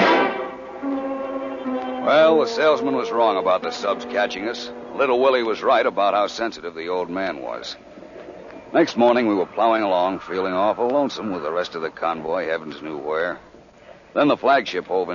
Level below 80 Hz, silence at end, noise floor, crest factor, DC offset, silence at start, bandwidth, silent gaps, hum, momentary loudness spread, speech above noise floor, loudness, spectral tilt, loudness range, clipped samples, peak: -60 dBFS; 0 s; -46 dBFS; 16 dB; under 0.1%; 0 s; 7.4 kHz; none; none; 14 LU; 26 dB; -21 LUFS; -5 dB/octave; 4 LU; under 0.1%; -4 dBFS